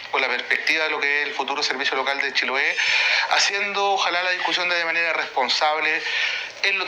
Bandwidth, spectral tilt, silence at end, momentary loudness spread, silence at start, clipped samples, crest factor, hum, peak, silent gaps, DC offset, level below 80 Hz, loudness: 19.5 kHz; 0 dB/octave; 0 s; 4 LU; 0 s; under 0.1%; 16 dB; none; -6 dBFS; none; under 0.1%; -70 dBFS; -20 LUFS